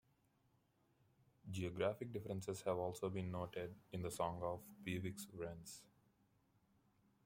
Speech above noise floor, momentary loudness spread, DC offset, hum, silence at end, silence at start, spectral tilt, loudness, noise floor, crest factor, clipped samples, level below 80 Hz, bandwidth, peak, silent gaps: 34 dB; 8 LU; under 0.1%; none; 1.4 s; 1.45 s; -5.5 dB/octave; -46 LUFS; -79 dBFS; 22 dB; under 0.1%; -74 dBFS; 16.5 kHz; -26 dBFS; none